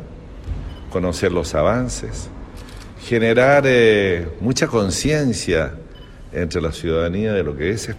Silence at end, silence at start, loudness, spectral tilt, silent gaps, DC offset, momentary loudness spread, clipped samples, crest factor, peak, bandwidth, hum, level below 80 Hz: 0 s; 0 s; -18 LUFS; -5 dB/octave; none; under 0.1%; 22 LU; under 0.1%; 18 dB; -2 dBFS; 14.5 kHz; none; -34 dBFS